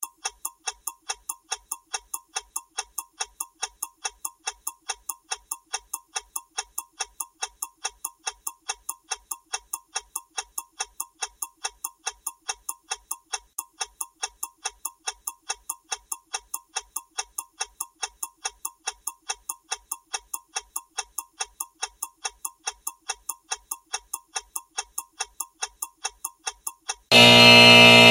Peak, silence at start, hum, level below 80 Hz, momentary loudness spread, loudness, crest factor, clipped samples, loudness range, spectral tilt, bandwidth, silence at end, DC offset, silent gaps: 0 dBFS; 0 s; none; -60 dBFS; 2 LU; -23 LUFS; 24 dB; under 0.1%; 0 LU; -2 dB/octave; 16.5 kHz; 0 s; under 0.1%; none